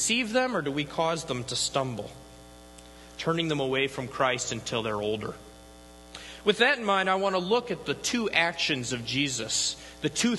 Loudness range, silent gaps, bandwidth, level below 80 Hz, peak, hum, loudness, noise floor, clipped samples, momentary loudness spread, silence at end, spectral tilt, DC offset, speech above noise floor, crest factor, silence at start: 4 LU; none; 12.5 kHz; -56 dBFS; -6 dBFS; none; -27 LUFS; -49 dBFS; under 0.1%; 11 LU; 0 s; -3 dB/octave; under 0.1%; 21 dB; 22 dB; 0 s